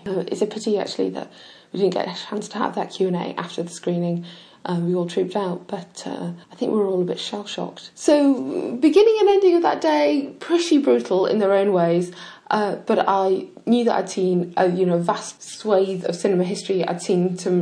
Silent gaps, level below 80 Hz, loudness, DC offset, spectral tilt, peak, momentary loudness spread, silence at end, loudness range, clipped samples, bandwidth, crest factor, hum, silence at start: none; -70 dBFS; -21 LUFS; under 0.1%; -6 dB/octave; -4 dBFS; 13 LU; 0 s; 8 LU; under 0.1%; 10.5 kHz; 16 dB; none; 0.05 s